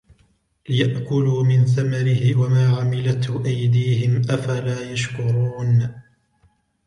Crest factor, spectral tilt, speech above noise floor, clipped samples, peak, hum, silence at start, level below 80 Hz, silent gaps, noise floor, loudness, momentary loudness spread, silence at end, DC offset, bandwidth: 14 dB; -7 dB/octave; 42 dB; under 0.1%; -6 dBFS; none; 0.7 s; -54 dBFS; none; -61 dBFS; -20 LUFS; 7 LU; 0.85 s; under 0.1%; 10 kHz